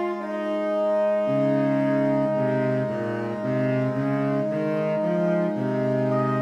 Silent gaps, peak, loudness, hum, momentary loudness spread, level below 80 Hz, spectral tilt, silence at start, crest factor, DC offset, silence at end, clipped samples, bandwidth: none; -12 dBFS; -24 LUFS; none; 5 LU; -68 dBFS; -9 dB/octave; 0 s; 12 dB; under 0.1%; 0 s; under 0.1%; 8.8 kHz